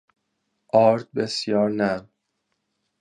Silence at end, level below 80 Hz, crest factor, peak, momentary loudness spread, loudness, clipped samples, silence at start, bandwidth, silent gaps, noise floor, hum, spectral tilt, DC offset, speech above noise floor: 1 s; -64 dBFS; 20 dB; -4 dBFS; 8 LU; -22 LUFS; under 0.1%; 0.75 s; 11 kHz; none; -76 dBFS; none; -5.5 dB/octave; under 0.1%; 55 dB